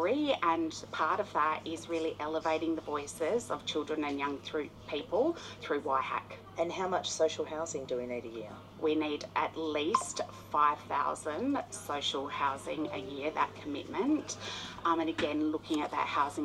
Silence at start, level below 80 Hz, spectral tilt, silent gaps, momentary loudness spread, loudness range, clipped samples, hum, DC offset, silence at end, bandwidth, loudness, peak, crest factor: 0 s; -66 dBFS; -4 dB/octave; none; 8 LU; 2 LU; under 0.1%; none; under 0.1%; 0 s; 13 kHz; -34 LUFS; -12 dBFS; 22 dB